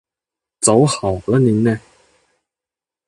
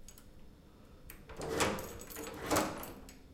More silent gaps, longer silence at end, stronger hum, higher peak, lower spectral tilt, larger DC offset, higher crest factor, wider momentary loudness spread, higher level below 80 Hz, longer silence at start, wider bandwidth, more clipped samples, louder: neither; first, 1.3 s vs 0 s; neither; first, 0 dBFS vs -16 dBFS; first, -5.5 dB/octave vs -3.5 dB/octave; neither; second, 18 dB vs 24 dB; second, 7 LU vs 22 LU; first, -46 dBFS vs -56 dBFS; first, 0.6 s vs 0 s; second, 11.5 kHz vs 17 kHz; neither; first, -16 LUFS vs -37 LUFS